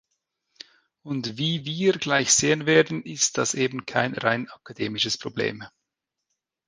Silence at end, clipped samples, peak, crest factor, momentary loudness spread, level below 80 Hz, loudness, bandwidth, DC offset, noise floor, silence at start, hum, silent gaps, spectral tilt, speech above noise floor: 1 s; under 0.1%; -4 dBFS; 22 dB; 12 LU; -64 dBFS; -23 LUFS; 10.5 kHz; under 0.1%; -84 dBFS; 1.05 s; none; none; -3 dB/octave; 59 dB